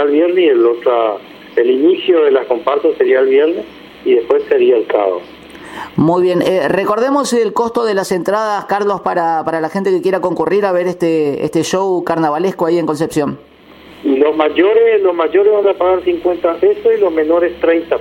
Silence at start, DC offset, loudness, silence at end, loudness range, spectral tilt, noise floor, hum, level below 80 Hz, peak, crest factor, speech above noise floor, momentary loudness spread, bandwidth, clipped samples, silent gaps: 0 s; under 0.1%; -13 LUFS; 0 s; 3 LU; -5.5 dB/octave; -39 dBFS; none; -52 dBFS; 0 dBFS; 12 dB; 26 dB; 6 LU; 16 kHz; under 0.1%; none